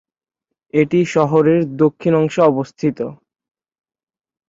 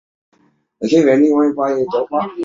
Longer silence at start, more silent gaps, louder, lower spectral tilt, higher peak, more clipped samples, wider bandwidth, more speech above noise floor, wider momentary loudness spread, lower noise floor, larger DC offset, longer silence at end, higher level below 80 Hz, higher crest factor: about the same, 0.75 s vs 0.8 s; neither; about the same, -16 LUFS vs -15 LUFS; about the same, -7.5 dB/octave vs -6.5 dB/octave; about the same, -2 dBFS vs -2 dBFS; neither; about the same, 7.8 kHz vs 7.6 kHz; first, 65 dB vs 37 dB; about the same, 8 LU vs 8 LU; first, -81 dBFS vs -52 dBFS; neither; first, 1.35 s vs 0 s; about the same, -60 dBFS vs -60 dBFS; about the same, 16 dB vs 14 dB